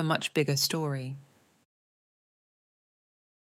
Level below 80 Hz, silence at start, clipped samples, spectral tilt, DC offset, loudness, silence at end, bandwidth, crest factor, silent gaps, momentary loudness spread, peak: -80 dBFS; 0 s; under 0.1%; -4 dB/octave; under 0.1%; -29 LUFS; 2.2 s; 17 kHz; 22 dB; none; 15 LU; -12 dBFS